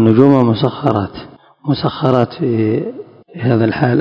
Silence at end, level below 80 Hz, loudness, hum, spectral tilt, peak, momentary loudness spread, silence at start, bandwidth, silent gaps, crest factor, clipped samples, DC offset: 0 s; -46 dBFS; -15 LUFS; none; -9.5 dB/octave; 0 dBFS; 17 LU; 0 s; 6 kHz; none; 14 dB; 0.6%; under 0.1%